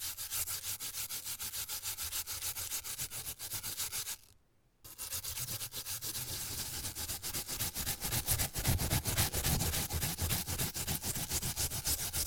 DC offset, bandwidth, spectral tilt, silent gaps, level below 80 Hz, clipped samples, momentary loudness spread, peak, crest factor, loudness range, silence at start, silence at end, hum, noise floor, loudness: under 0.1%; over 20 kHz; -2 dB/octave; none; -50 dBFS; under 0.1%; 7 LU; -16 dBFS; 20 dB; 6 LU; 0 s; 0 s; none; -69 dBFS; -36 LUFS